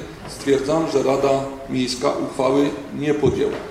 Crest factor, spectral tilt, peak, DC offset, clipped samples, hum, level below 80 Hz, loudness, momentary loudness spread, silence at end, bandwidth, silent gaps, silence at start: 16 dB; -5.5 dB/octave; -4 dBFS; under 0.1%; under 0.1%; none; -46 dBFS; -21 LUFS; 7 LU; 0 s; 13.5 kHz; none; 0 s